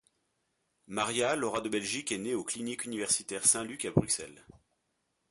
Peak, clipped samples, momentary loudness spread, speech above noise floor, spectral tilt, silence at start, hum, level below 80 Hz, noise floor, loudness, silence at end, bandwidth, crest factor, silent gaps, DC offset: -10 dBFS; under 0.1%; 9 LU; 47 dB; -3 dB/octave; 0.9 s; none; -62 dBFS; -80 dBFS; -31 LUFS; 0.9 s; 12 kHz; 24 dB; none; under 0.1%